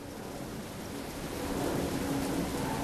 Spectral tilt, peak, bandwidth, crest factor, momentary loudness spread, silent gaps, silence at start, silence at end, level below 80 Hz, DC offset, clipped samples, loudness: -5 dB/octave; -22 dBFS; 13.5 kHz; 14 dB; 8 LU; none; 0 s; 0 s; -50 dBFS; under 0.1%; under 0.1%; -35 LUFS